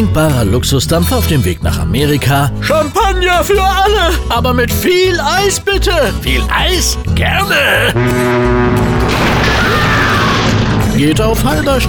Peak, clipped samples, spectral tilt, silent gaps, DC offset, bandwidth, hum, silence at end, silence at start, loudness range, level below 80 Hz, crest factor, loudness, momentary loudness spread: -2 dBFS; under 0.1%; -4.5 dB/octave; none; under 0.1%; over 20 kHz; none; 0 s; 0 s; 1 LU; -20 dBFS; 10 dB; -11 LUFS; 3 LU